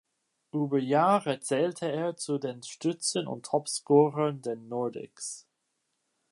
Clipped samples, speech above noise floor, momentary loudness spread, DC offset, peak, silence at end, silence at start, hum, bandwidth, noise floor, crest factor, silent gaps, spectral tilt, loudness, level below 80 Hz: under 0.1%; 51 dB; 14 LU; under 0.1%; -10 dBFS; 0.9 s; 0.55 s; none; 11.5 kHz; -79 dBFS; 20 dB; none; -5 dB/octave; -29 LUFS; -82 dBFS